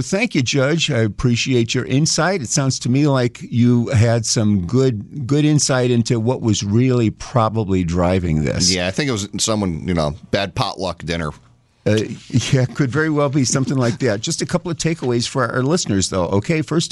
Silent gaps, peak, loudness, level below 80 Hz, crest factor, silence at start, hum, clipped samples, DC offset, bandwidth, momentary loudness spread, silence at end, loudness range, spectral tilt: none; -4 dBFS; -18 LUFS; -42 dBFS; 14 dB; 0 s; none; under 0.1%; under 0.1%; 12 kHz; 6 LU; 0.05 s; 4 LU; -5 dB/octave